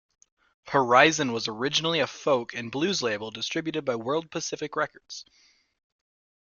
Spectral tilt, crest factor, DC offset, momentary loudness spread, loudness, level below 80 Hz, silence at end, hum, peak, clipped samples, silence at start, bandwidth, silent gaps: -3.5 dB/octave; 24 dB; under 0.1%; 13 LU; -26 LUFS; -68 dBFS; 1.2 s; none; -2 dBFS; under 0.1%; 0.65 s; 7.4 kHz; none